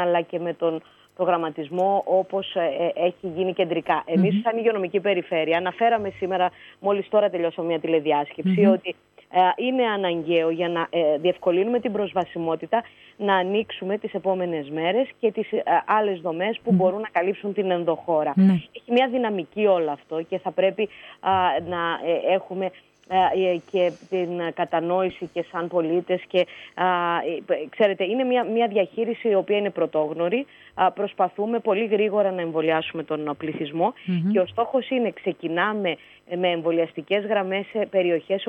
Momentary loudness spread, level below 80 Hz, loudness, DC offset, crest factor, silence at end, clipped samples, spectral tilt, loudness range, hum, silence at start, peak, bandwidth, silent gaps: 7 LU; -70 dBFS; -24 LUFS; under 0.1%; 16 dB; 0 s; under 0.1%; -8 dB/octave; 3 LU; none; 0 s; -6 dBFS; 6.4 kHz; none